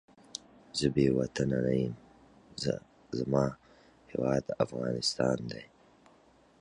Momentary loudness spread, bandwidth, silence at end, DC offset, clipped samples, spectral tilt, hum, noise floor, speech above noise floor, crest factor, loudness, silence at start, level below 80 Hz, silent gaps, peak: 16 LU; 11 kHz; 0.95 s; under 0.1%; under 0.1%; -5.5 dB/octave; none; -62 dBFS; 32 dB; 20 dB; -32 LUFS; 0.35 s; -56 dBFS; none; -12 dBFS